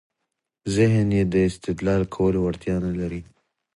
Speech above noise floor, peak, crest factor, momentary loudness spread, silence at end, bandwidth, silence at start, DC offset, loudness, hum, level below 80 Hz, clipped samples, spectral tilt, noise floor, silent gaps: 59 dB; -8 dBFS; 16 dB; 10 LU; 0.55 s; 11.5 kHz; 0.65 s; under 0.1%; -23 LUFS; none; -42 dBFS; under 0.1%; -7.5 dB/octave; -81 dBFS; none